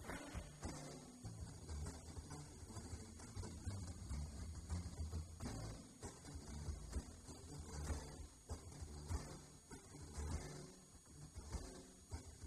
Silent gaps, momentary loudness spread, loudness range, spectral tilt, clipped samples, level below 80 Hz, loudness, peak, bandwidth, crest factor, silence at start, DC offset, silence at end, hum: none; 8 LU; 2 LU; -5 dB/octave; under 0.1%; -54 dBFS; -53 LUFS; -32 dBFS; 14 kHz; 18 dB; 0 s; under 0.1%; 0 s; none